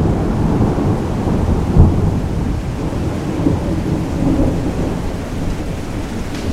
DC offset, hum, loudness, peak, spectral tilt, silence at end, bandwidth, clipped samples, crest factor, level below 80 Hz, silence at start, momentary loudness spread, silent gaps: under 0.1%; none; -18 LUFS; 0 dBFS; -8 dB/octave; 0 s; 14 kHz; under 0.1%; 16 dB; -22 dBFS; 0 s; 10 LU; none